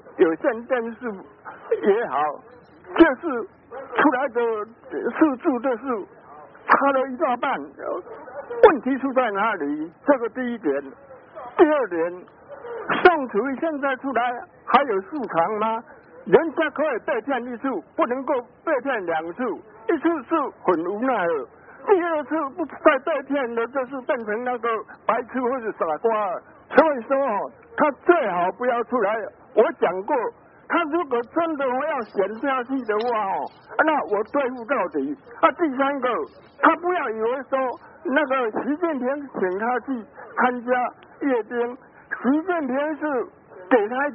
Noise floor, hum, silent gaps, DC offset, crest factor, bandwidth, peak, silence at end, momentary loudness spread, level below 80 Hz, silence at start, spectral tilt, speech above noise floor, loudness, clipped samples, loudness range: -44 dBFS; none; none; under 0.1%; 22 dB; 3.9 kHz; -2 dBFS; 0 s; 12 LU; -62 dBFS; 0.05 s; 0.5 dB/octave; 22 dB; -23 LUFS; under 0.1%; 3 LU